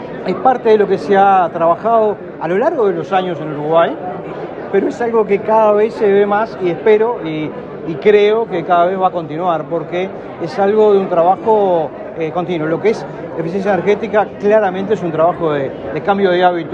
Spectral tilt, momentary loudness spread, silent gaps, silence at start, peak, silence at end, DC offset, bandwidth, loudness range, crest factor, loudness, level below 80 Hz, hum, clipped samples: -7.5 dB/octave; 11 LU; none; 0 s; 0 dBFS; 0 s; under 0.1%; 7.4 kHz; 3 LU; 14 dB; -14 LUFS; -54 dBFS; none; under 0.1%